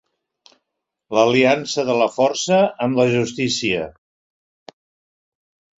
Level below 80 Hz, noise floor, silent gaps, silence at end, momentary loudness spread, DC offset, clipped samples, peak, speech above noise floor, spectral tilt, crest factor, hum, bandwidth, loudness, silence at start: -58 dBFS; -79 dBFS; none; 1.9 s; 7 LU; under 0.1%; under 0.1%; -2 dBFS; 62 dB; -4.5 dB/octave; 18 dB; none; 8 kHz; -18 LUFS; 1.1 s